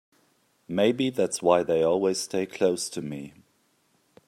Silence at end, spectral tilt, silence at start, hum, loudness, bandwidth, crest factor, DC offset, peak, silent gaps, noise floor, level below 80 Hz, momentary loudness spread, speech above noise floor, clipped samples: 1 s; -4.5 dB/octave; 0.7 s; none; -25 LUFS; 15 kHz; 20 dB; under 0.1%; -6 dBFS; none; -68 dBFS; -68 dBFS; 13 LU; 43 dB; under 0.1%